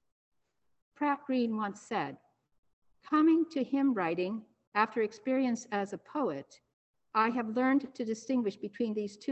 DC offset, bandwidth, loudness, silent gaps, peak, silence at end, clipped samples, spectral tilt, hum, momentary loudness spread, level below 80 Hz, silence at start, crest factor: under 0.1%; 8.4 kHz; -32 LUFS; 2.58-2.63 s, 2.73-2.82 s, 4.67-4.72 s, 6.73-6.94 s; -12 dBFS; 0 s; under 0.1%; -5.5 dB/octave; none; 9 LU; -80 dBFS; 1 s; 20 dB